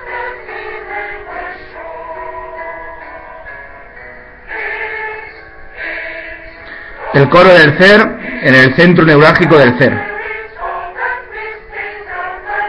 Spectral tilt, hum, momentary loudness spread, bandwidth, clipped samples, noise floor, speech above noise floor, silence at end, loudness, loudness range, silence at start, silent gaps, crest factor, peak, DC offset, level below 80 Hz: -7 dB/octave; none; 24 LU; 11 kHz; 0.5%; -33 dBFS; 27 dB; 0 s; -9 LUFS; 19 LU; 0 s; none; 12 dB; 0 dBFS; under 0.1%; -40 dBFS